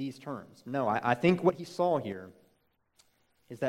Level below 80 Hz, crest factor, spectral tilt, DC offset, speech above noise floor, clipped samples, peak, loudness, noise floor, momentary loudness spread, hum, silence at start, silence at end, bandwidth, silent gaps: -70 dBFS; 22 dB; -7 dB/octave; under 0.1%; 42 dB; under 0.1%; -10 dBFS; -30 LUFS; -73 dBFS; 17 LU; none; 0 s; 0 s; 14 kHz; none